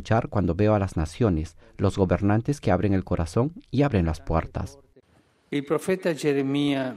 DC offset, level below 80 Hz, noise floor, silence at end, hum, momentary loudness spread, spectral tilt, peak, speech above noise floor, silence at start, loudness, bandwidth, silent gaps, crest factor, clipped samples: under 0.1%; -40 dBFS; -62 dBFS; 0 s; none; 7 LU; -7.5 dB/octave; -8 dBFS; 38 dB; 0 s; -25 LUFS; 13.5 kHz; none; 16 dB; under 0.1%